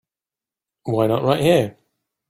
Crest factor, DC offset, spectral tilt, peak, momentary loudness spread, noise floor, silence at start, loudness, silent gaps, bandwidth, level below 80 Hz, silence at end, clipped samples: 20 dB; under 0.1%; -6.5 dB/octave; -2 dBFS; 12 LU; -90 dBFS; 0.85 s; -19 LUFS; none; 16 kHz; -56 dBFS; 0.6 s; under 0.1%